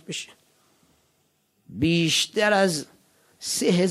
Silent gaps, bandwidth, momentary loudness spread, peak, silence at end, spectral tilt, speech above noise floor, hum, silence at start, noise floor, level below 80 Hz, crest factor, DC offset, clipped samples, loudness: none; 15.5 kHz; 21 LU; -8 dBFS; 0 s; -4 dB/octave; 46 dB; none; 0.1 s; -68 dBFS; -60 dBFS; 18 dB; under 0.1%; under 0.1%; -23 LUFS